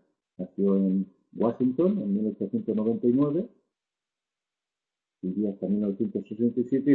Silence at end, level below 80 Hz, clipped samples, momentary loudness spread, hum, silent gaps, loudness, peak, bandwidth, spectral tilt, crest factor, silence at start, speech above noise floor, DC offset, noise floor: 0 s; -70 dBFS; under 0.1%; 10 LU; none; none; -27 LUFS; -10 dBFS; 4 kHz; -12 dB/octave; 18 dB; 0.4 s; 64 dB; under 0.1%; -90 dBFS